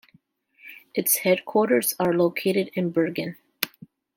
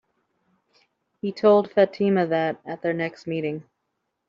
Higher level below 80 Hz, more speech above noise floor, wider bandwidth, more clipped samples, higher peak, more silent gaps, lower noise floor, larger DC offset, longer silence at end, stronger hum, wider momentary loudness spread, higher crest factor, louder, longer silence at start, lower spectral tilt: about the same, -70 dBFS vs -70 dBFS; second, 39 dB vs 55 dB; first, 17 kHz vs 7.2 kHz; neither; first, -2 dBFS vs -6 dBFS; neither; second, -62 dBFS vs -78 dBFS; neither; second, 0.5 s vs 0.65 s; neither; about the same, 11 LU vs 13 LU; first, 24 dB vs 18 dB; about the same, -23 LUFS vs -23 LUFS; second, 0.65 s vs 1.25 s; second, -4 dB/octave vs -5.5 dB/octave